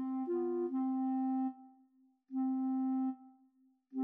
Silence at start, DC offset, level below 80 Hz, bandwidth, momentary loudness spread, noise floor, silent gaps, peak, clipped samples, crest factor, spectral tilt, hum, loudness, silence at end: 0 s; under 0.1%; under -90 dBFS; 2.2 kHz; 9 LU; -71 dBFS; none; -28 dBFS; under 0.1%; 8 dB; -8.5 dB/octave; none; -36 LUFS; 0 s